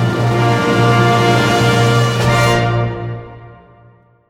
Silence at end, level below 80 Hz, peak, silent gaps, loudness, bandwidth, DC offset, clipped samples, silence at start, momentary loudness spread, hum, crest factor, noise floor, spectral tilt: 0.75 s; -36 dBFS; -2 dBFS; none; -13 LUFS; 15.5 kHz; under 0.1%; under 0.1%; 0 s; 9 LU; none; 12 dB; -47 dBFS; -5.5 dB/octave